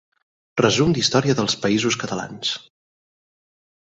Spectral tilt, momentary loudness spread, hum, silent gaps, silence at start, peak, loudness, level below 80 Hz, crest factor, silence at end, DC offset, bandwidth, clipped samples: -4 dB/octave; 10 LU; none; none; 0.55 s; -2 dBFS; -20 LUFS; -52 dBFS; 20 dB; 1.3 s; under 0.1%; 8.2 kHz; under 0.1%